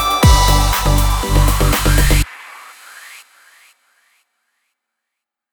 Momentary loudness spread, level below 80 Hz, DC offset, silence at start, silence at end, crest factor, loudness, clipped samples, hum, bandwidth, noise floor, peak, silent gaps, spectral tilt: 25 LU; -18 dBFS; under 0.1%; 0 s; 2.35 s; 16 dB; -14 LUFS; under 0.1%; none; over 20 kHz; -81 dBFS; 0 dBFS; none; -4 dB/octave